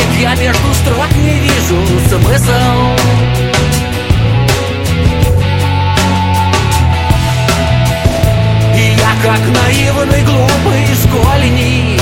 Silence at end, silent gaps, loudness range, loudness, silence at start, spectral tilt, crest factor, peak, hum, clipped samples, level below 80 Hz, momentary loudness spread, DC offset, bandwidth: 0 s; none; 2 LU; -10 LUFS; 0 s; -5 dB/octave; 10 dB; 0 dBFS; none; under 0.1%; -20 dBFS; 2 LU; under 0.1%; 17 kHz